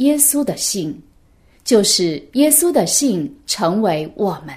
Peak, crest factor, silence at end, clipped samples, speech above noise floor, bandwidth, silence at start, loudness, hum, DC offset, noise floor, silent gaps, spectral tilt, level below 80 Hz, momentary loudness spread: 0 dBFS; 18 dB; 0 s; under 0.1%; 35 dB; 16 kHz; 0 s; -16 LUFS; none; under 0.1%; -52 dBFS; none; -3 dB/octave; -54 dBFS; 11 LU